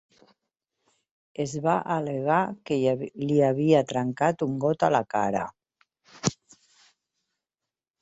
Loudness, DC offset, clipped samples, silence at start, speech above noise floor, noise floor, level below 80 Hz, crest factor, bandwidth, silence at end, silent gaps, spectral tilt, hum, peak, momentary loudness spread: -26 LUFS; under 0.1%; under 0.1%; 1.4 s; 65 dB; -90 dBFS; -66 dBFS; 20 dB; 8.2 kHz; 1.7 s; none; -6 dB/octave; none; -8 dBFS; 9 LU